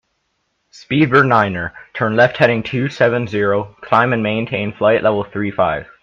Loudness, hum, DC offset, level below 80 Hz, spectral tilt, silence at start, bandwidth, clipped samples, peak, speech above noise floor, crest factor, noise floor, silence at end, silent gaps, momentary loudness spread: -16 LUFS; none; under 0.1%; -52 dBFS; -7.5 dB/octave; 0.75 s; 7.4 kHz; under 0.1%; 0 dBFS; 52 dB; 16 dB; -68 dBFS; 0.2 s; none; 9 LU